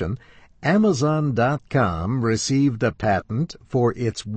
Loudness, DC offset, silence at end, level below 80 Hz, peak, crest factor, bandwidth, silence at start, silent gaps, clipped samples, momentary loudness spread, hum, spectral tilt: -22 LUFS; under 0.1%; 0 s; -46 dBFS; -8 dBFS; 14 dB; 8.8 kHz; 0 s; none; under 0.1%; 8 LU; none; -6 dB/octave